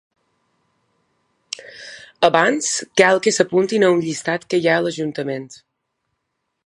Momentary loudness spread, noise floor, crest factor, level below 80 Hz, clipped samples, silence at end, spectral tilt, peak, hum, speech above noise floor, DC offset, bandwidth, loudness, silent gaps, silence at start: 18 LU; -75 dBFS; 20 dB; -68 dBFS; under 0.1%; 1.1 s; -3.5 dB/octave; 0 dBFS; none; 58 dB; under 0.1%; 11.5 kHz; -18 LUFS; none; 1.6 s